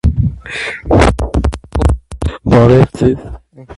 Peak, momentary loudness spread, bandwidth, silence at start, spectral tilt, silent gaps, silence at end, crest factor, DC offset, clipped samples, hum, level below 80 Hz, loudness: 0 dBFS; 12 LU; 11.5 kHz; 0.05 s; -7.5 dB/octave; none; 0.05 s; 12 dB; under 0.1%; under 0.1%; none; -20 dBFS; -13 LUFS